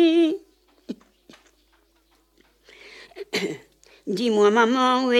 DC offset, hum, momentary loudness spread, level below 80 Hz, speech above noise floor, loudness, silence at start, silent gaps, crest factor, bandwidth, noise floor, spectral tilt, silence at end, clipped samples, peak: under 0.1%; none; 23 LU; -68 dBFS; 43 dB; -21 LUFS; 0 s; none; 18 dB; 13.5 kHz; -63 dBFS; -4.5 dB/octave; 0 s; under 0.1%; -6 dBFS